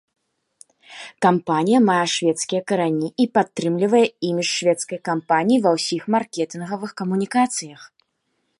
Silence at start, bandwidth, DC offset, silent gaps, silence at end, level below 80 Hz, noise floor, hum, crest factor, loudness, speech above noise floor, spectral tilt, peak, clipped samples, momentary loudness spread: 0.9 s; 11.5 kHz; under 0.1%; none; 0.75 s; -70 dBFS; -72 dBFS; none; 18 dB; -20 LUFS; 52 dB; -4.5 dB/octave; -2 dBFS; under 0.1%; 10 LU